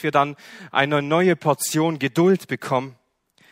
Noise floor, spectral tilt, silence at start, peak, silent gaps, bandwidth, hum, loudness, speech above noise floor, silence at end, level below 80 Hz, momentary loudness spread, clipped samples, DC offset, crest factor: -60 dBFS; -5 dB/octave; 0 s; 0 dBFS; none; 16 kHz; none; -21 LUFS; 40 dB; 0.6 s; -66 dBFS; 7 LU; under 0.1%; under 0.1%; 20 dB